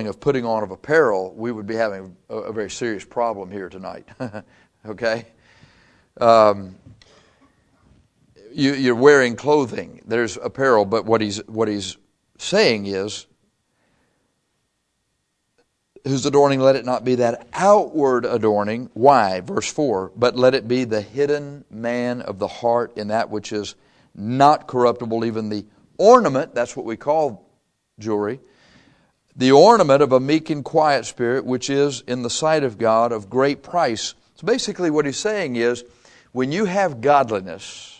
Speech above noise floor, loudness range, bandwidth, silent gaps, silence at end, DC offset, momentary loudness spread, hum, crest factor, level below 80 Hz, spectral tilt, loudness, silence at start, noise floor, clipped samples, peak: 53 dB; 8 LU; 10 kHz; none; 0.1 s; under 0.1%; 16 LU; none; 20 dB; -60 dBFS; -5 dB/octave; -19 LUFS; 0 s; -72 dBFS; under 0.1%; 0 dBFS